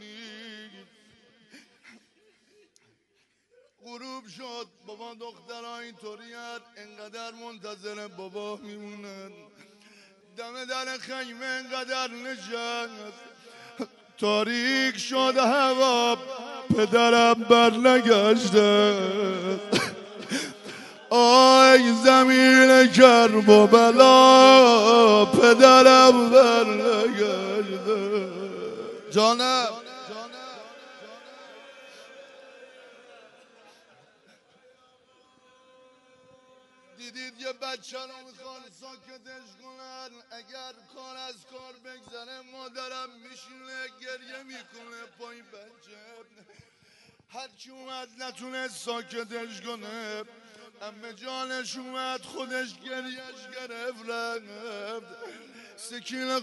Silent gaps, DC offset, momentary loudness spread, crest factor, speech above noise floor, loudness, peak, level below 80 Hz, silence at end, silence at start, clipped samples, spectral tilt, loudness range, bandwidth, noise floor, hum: none; under 0.1%; 28 LU; 22 dB; 49 dB; -18 LUFS; 0 dBFS; -76 dBFS; 0 s; 0.45 s; under 0.1%; -3.5 dB/octave; 28 LU; 11.5 kHz; -70 dBFS; none